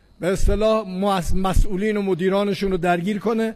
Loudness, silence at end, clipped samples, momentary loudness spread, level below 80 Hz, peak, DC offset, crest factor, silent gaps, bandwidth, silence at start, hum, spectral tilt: -21 LUFS; 0 s; under 0.1%; 3 LU; -26 dBFS; -6 dBFS; under 0.1%; 14 dB; none; 13.5 kHz; 0.2 s; none; -6 dB/octave